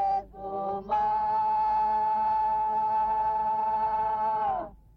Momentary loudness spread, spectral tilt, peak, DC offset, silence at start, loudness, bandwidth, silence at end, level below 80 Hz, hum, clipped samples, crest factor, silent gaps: 7 LU; -7 dB/octave; -18 dBFS; under 0.1%; 0 s; -27 LUFS; 5.4 kHz; 0.2 s; -54 dBFS; none; under 0.1%; 8 dB; none